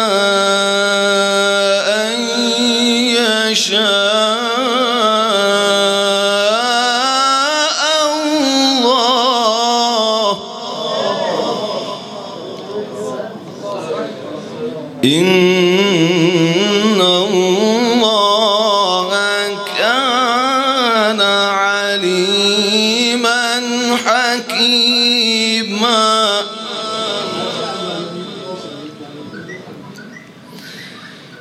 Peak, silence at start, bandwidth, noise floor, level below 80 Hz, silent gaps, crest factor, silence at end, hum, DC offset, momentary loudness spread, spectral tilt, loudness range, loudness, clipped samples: 0 dBFS; 0 s; 15 kHz; -36 dBFS; -68 dBFS; none; 14 dB; 0 s; none; under 0.1%; 16 LU; -3 dB/octave; 10 LU; -13 LUFS; under 0.1%